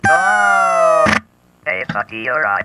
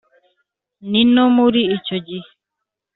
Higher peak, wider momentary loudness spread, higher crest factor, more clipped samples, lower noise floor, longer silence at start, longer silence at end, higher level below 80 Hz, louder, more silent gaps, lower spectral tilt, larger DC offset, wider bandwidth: about the same, 0 dBFS vs -2 dBFS; second, 10 LU vs 19 LU; about the same, 14 dB vs 16 dB; neither; second, -35 dBFS vs -81 dBFS; second, 0.05 s vs 0.85 s; second, 0 s vs 0.75 s; first, -48 dBFS vs -58 dBFS; about the same, -14 LUFS vs -15 LUFS; neither; about the same, -4 dB/octave vs -3.5 dB/octave; neither; first, 12.5 kHz vs 4.2 kHz